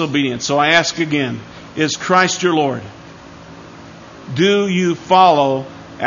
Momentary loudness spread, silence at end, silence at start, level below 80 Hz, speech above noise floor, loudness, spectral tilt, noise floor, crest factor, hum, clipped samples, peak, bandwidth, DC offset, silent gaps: 17 LU; 0 s; 0 s; -54 dBFS; 22 dB; -15 LUFS; -4 dB/octave; -37 dBFS; 16 dB; none; under 0.1%; 0 dBFS; 7.4 kHz; under 0.1%; none